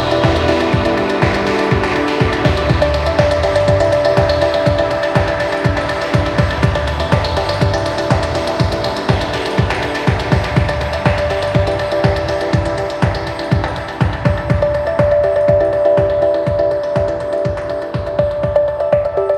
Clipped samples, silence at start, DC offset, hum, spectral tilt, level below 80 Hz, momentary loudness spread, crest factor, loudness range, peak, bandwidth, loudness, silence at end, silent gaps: under 0.1%; 0 s; under 0.1%; none; -6.5 dB/octave; -28 dBFS; 5 LU; 14 dB; 3 LU; 0 dBFS; 12 kHz; -15 LUFS; 0 s; none